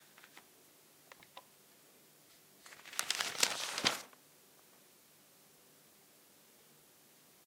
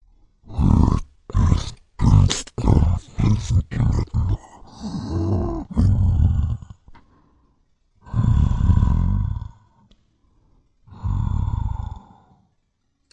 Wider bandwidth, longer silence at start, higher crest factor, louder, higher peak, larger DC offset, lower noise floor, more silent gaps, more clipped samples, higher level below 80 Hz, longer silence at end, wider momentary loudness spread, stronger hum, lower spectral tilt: first, 17 kHz vs 9.8 kHz; second, 0.15 s vs 0.5 s; first, 36 dB vs 20 dB; second, -35 LUFS vs -21 LUFS; second, -10 dBFS vs 0 dBFS; neither; second, -65 dBFS vs -69 dBFS; neither; neither; second, -88 dBFS vs -26 dBFS; first, 3.35 s vs 1.15 s; first, 28 LU vs 14 LU; neither; second, 0 dB/octave vs -7 dB/octave